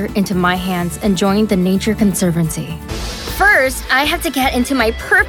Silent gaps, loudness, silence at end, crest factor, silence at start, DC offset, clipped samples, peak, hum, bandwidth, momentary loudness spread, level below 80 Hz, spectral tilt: none; -15 LUFS; 0 s; 12 dB; 0 s; under 0.1%; under 0.1%; -2 dBFS; none; 18.5 kHz; 11 LU; -30 dBFS; -4.5 dB/octave